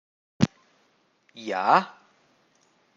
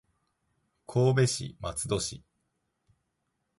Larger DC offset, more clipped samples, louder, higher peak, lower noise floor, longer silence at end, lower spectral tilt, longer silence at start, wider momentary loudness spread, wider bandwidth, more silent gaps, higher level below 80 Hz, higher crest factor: neither; neither; first, -24 LUFS vs -29 LUFS; first, -4 dBFS vs -14 dBFS; second, -66 dBFS vs -80 dBFS; second, 1.05 s vs 1.4 s; about the same, -6 dB/octave vs -5 dB/octave; second, 0.4 s vs 0.9 s; first, 18 LU vs 12 LU; second, 7.8 kHz vs 11.5 kHz; neither; second, -62 dBFS vs -56 dBFS; first, 26 dB vs 18 dB